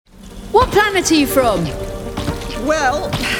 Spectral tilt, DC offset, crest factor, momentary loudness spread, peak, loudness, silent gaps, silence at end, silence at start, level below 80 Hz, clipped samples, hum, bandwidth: -4 dB/octave; under 0.1%; 16 dB; 11 LU; 0 dBFS; -16 LUFS; none; 0 s; 0.15 s; -32 dBFS; under 0.1%; none; 19.5 kHz